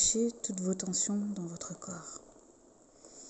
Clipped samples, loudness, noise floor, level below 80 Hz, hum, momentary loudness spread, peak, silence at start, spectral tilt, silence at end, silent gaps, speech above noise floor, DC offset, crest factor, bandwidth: under 0.1%; -34 LUFS; -61 dBFS; -64 dBFS; none; 15 LU; -16 dBFS; 0 s; -3.5 dB/octave; 0 s; none; 26 dB; under 0.1%; 20 dB; 8.8 kHz